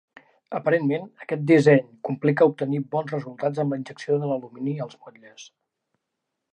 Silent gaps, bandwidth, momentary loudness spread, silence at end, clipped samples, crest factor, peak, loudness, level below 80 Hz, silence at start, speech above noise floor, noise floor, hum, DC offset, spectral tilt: none; 9.8 kHz; 13 LU; 1.1 s; under 0.1%; 20 dB; -4 dBFS; -23 LUFS; -76 dBFS; 0.5 s; 58 dB; -81 dBFS; none; under 0.1%; -8 dB/octave